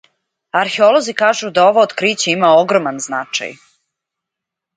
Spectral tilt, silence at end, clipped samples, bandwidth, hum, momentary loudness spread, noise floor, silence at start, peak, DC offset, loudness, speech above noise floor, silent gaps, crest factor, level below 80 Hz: -3 dB/octave; 1.2 s; under 0.1%; 9.4 kHz; none; 10 LU; -82 dBFS; 0.55 s; 0 dBFS; under 0.1%; -14 LUFS; 69 dB; none; 16 dB; -66 dBFS